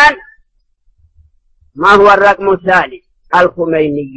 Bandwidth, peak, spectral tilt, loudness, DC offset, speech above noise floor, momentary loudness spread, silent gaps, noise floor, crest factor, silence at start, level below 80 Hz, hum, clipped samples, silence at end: 10 kHz; 0 dBFS; -5 dB/octave; -10 LUFS; under 0.1%; 45 dB; 8 LU; none; -55 dBFS; 12 dB; 0 s; -42 dBFS; none; 0.6%; 0 s